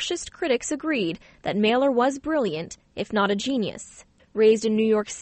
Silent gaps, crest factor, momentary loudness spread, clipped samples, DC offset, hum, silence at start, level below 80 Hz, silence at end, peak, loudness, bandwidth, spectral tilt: none; 16 dB; 14 LU; under 0.1%; under 0.1%; none; 0 s; -58 dBFS; 0 s; -8 dBFS; -24 LUFS; 8.8 kHz; -4.5 dB/octave